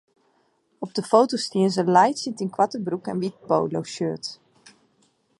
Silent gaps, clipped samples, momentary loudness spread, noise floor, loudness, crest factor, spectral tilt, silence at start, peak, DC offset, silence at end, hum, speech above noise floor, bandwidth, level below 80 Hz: none; under 0.1%; 12 LU; -66 dBFS; -23 LUFS; 22 dB; -5.5 dB/octave; 0.8 s; -2 dBFS; under 0.1%; 1.05 s; none; 44 dB; 11.5 kHz; -72 dBFS